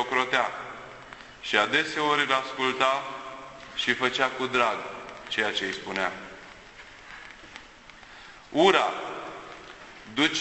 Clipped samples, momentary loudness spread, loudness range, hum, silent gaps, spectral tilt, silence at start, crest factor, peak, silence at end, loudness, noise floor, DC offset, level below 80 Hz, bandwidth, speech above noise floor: under 0.1%; 22 LU; 7 LU; none; none; -3 dB/octave; 0 s; 22 dB; -6 dBFS; 0 s; -26 LUFS; -49 dBFS; under 0.1%; -62 dBFS; 8.4 kHz; 23 dB